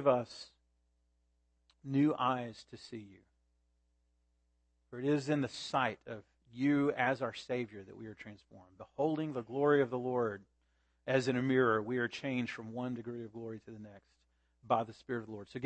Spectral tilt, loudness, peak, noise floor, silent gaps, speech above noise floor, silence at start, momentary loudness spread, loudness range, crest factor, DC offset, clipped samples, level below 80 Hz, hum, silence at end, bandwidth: -6.5 dB/octave; -35 LUFS; -14 dBFS; -77 dBFS; none; 41 dB; 0 s; 20 LU; 6 LU; 22 dB; under 0.1%; under 0.1%; -76 dBFS; none; 0 s; 8.4 kHz